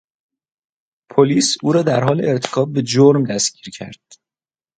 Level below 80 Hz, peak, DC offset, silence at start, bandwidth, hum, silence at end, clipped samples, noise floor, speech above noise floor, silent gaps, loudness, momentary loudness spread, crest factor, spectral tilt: -60 dBFS; 0 dBFS; under 0.1%; 1.15 s; 9.4 kHz; none; 0.85 s; under 0.1%; under -90 dBFS; over 74 dB; none; -16 LUFS; 19 LU; 18 dB; -5 dB/octave